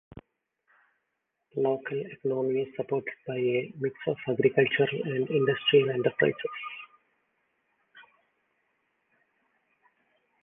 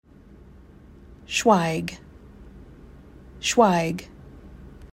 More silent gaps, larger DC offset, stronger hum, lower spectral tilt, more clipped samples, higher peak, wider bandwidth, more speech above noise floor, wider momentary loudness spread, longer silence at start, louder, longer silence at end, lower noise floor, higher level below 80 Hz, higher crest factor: neither; neither; neither; first, -9 dB/octave vs -4.5 dB/octave; neither; second, -8 dBFS vs -4 dBFS; second, 3.8 kHz vs 16 kHz; first, 54 dB vs 28 dB; second, 12 LU vs 27 LU; second, 0.15 s vs 1.1 s; second, -28 LUFS vs -22 LUFS; first, 2.4 s vs 0.05 s; first, -81 dBFS vs -49 dBFS; second, -70 dBFS vs -50 dBFS; about the same, 22 dB vs 22 dB